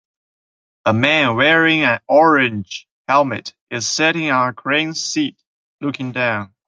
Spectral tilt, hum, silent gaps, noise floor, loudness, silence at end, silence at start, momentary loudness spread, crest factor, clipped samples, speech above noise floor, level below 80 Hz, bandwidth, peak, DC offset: -4 dB/octave; none; 2.91-3.05 s, 3.61-3.67 s, 5.47-5.79 s; under -90 dBFS; -16 LUFS; 0.2 s; 0.85 s; 14 LU; 18 dB; under 0.1%; over 73 dB; -62 dBFS; 9.4 kHz; 0 dBFS; under 0.1%